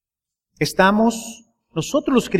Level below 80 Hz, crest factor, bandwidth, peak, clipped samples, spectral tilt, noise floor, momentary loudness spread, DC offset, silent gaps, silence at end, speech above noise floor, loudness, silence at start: -50 dBFS; 18 dB; 16 kHz; -2 dBFS; under 0.1%; -5 dB/octave; -87 dBFS; 15 LU; under 0.1%; none; 0 s; 68 dB; -19 LUFS; 0.6 s